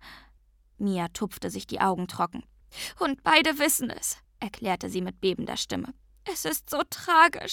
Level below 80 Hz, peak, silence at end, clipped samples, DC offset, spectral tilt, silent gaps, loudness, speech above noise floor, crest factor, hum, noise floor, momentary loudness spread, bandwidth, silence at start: -58 dBFS; -4 dBFS; 0 s; under 0.1%; under 0.1%; -3 dB/octave; none; -27 LUFS; 33 dB; 24 dB; none; -60 dBFS; 16 LU; 19 kHz; 0.05 s